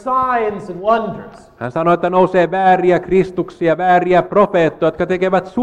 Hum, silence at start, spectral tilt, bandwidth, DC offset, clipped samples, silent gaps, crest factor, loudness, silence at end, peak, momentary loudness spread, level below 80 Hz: none; 0.05 s; -7.5 dB/octave; 8.8 kHz; under 0.1%; under 0.1%; none; 14 dB; -15 LUFS; 0 s; -2 dBFS; 9 LU; -46 dBFS